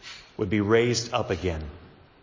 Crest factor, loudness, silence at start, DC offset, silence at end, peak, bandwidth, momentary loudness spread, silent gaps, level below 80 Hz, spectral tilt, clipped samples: 18 dB; -26 LUFS; 0.05 s; under 0.1%; 0.35 s; -10 dBFS; 7.6 kHz; 16 LU; none; -44 dBFS; -5 dB/octave; under 0.1%